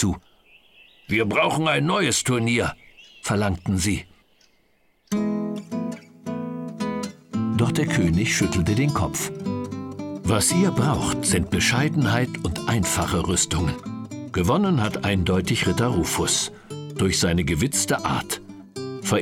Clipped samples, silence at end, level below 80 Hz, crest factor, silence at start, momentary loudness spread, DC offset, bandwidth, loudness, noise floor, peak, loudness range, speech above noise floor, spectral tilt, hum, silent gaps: under 0.1%; 0 s; -42 dBFS; 16 dB; 0 s; 12 LU; under 0.1%; 18 kHz; -23 LUFS; -64 dBFS; -8 dBFS; 6 LU; 43 dB; -4.5 dB/octave; none; none